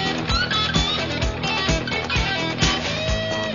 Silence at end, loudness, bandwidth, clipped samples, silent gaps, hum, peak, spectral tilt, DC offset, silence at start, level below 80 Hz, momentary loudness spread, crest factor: 0 s; -21 LUFS; 7.4 kHz; under 0.1%; none; none; -4 dBFS; -4 dB/octave; 0.2%; 0 s; -32 dBFS; 4 LU; 18 dB